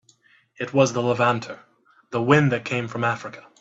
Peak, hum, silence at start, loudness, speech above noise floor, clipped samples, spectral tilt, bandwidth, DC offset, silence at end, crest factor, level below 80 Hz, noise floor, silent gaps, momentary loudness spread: -2 dBFS; none; 0.6 s; -22 LUFS; 37 dB; under 0.1%; -6 dB/octave; 8 kHz; under 0.1%; 0.2 s; 22 dB; -62 dBFS; -59 dBFS; none; 17 LU